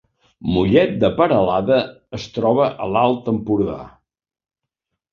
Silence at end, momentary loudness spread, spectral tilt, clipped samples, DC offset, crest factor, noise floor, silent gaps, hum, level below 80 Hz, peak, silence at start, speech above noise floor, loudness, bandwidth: 1.25 s; 13 LU; -7.5 dB/octave; under 0.1%; under 0.1%; 18 dB; -80 dBFS; none; none; -44 dBFS; -2 dBFS; 0.4 s; 62 dB; -18 LUFS; 7.2 kHz